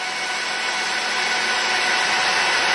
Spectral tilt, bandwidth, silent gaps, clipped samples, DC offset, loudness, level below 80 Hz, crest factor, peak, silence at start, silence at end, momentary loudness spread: 0.5 dB/octave; 11.5 kHz; none; under 0.1%; under 0.1%; -19 LUFS; -64 dBFS; 14 dB; -6 dBFS; 0 s; 0 s; 5 LU